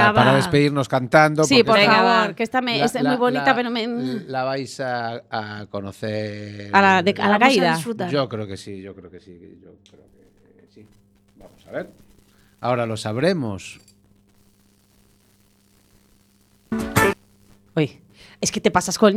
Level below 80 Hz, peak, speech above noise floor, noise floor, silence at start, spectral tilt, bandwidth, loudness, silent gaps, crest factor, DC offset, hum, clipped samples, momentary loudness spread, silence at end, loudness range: -54 dBFS; 0 dBFS; 38 dB; -58 dBFS; 0 s; -4.5 dB/octave; 15.5 kHz; -19 LUFS; none; 22 dB; under 0.1%; 50 Hz at -50 dBFS; under 0.1%; 18 LU; 0 s; 19 LU